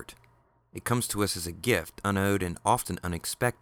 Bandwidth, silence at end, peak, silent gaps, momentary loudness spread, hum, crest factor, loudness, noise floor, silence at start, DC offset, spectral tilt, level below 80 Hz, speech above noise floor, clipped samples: over 20 kHz; 0.1 s; -10 dBFS; none; 7 LU; none; 20 dB; -29 LUFS; -64 dBFS; 0 s; under 0.1%; -4.5 dB/octave; -52 dBFS; 35 dB; under 0.1%